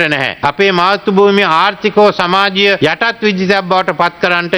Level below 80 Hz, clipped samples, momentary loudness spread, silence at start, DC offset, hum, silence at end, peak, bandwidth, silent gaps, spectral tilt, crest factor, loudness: -50 dBFS; 0.2%; 4 LU; 0 s; under 0.1%; none; 0 s; 0 dBFS; 12 kHz; none; -5.5 dB/octave; 12 dB; -11 LUFS